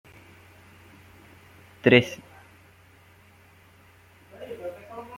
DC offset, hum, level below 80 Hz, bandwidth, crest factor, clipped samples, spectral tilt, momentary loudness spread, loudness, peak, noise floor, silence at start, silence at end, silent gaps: under 0.1%; none; -66 dBFS; 16.5 kHz; 28 dB; under 0.1%; -6 dB/octave; 24 LU; -23 LUFS; -2 dBFS; -55 dBFS; 1.85 s; 0 s; none